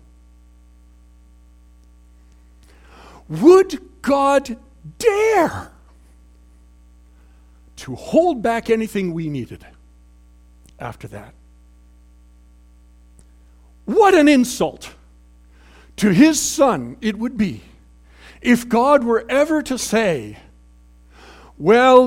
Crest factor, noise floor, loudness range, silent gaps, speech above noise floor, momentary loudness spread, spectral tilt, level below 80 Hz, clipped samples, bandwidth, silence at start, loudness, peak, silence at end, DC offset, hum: 20 dB; -48 dBFS; 7 LU; none; 32 dB; 22 LU; -5 dB/octave; -48 dBFS; under 0.1%; 16.5 kHz; 3.3 s; -17 LUFS; 0 dBFS; 0 s; under 0.1%; 60 Hz at -45 dBFS